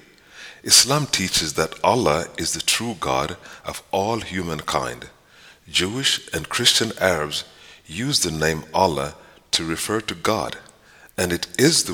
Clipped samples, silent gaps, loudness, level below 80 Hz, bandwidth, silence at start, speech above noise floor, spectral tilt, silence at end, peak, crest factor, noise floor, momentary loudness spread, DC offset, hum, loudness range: under 0.1%; none; -20 LUFS; -48 dBFS; over 20 kHz; 0.35 s; 28 dB; -2.5 dB/octave; 0 s; 0 dBFS; 22 dB; -50 dBFS; 16 LU; under 0.1%; none; 6 LU